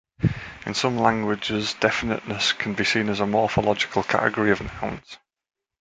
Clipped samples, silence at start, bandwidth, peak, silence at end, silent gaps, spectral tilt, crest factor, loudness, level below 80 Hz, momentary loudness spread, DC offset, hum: under 0.1%; 0.2 s; 9.4 kHz; -2 dBFS; 0.65 s; none; -4.5 dB/octave; 22 dB; -23 LUFS; -48 dBFS; 8 LU; under 0.1%; none